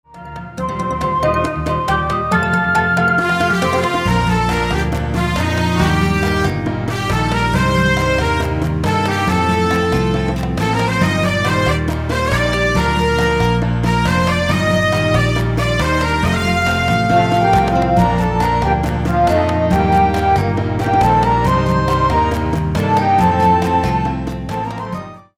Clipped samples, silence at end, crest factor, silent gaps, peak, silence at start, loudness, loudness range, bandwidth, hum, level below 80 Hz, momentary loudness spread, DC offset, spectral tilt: under 0.1%; 0.15 s; 14 dB; none; -2 dBFS; 0.15 s; -16 LUFS; 2 LU; 16 kHz; none; -28 dBFS; 5 LU; under 0.1%; -6 dB/octave